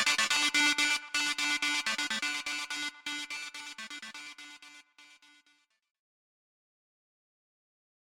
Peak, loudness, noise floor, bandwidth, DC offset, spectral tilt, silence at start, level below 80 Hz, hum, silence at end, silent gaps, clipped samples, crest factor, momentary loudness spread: -14 dBFS; -29 LUFS; -71 dBFS; over 20 kHz; under 0.1%; 1.5 dB/octave; 0 s; -76 dBFS; none; 3.05 s; none; under 0.1%; 22 dB; 19 LU